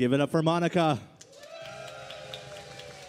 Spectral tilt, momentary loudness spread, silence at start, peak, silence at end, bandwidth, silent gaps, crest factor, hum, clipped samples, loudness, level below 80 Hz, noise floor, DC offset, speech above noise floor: -6.5 dB/octave; 20 LU; 0 s; -12 dBFS; 0 s; 13.5 kHz; none; 18 dB; none; under 0.1%; -26 LUFS; -68 dBFS; -47 dBFS; under 0.1%; 22 dB